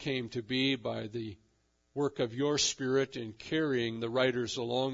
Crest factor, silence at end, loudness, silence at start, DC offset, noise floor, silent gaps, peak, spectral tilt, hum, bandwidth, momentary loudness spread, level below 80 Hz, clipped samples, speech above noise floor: 18 dB; 0 s; -32 LUFS; 0 s; under 0.1%; -73 dBFS; none; -14 dBFS; -4 dB/octave; none; 7.8 kHz; 11 LU; -68 dBFS; under 0.1%; 41 dB